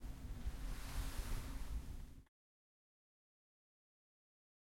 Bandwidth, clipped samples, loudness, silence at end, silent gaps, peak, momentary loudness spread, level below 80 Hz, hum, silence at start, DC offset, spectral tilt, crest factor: 16.5 kHz; under 0.1%; -50 LUFS; 2.45 s; none; -30 dBFS; 9 LU; -50 dBFS; none; 0 s; under 0.1%; -4.5 dB/octave; 16 dB